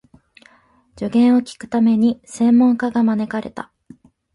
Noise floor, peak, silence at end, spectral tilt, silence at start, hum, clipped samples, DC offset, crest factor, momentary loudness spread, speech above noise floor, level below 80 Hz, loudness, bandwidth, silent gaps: -55 dBFS; -6 dBFS; 0.7 s; -6.5 dB/octave; 0.95 s; none; under 0.1%; under 0.1%; 12 dB; 15 LU; 39 dB; -58 dBFS; -17 LUFS; 11 kHz; none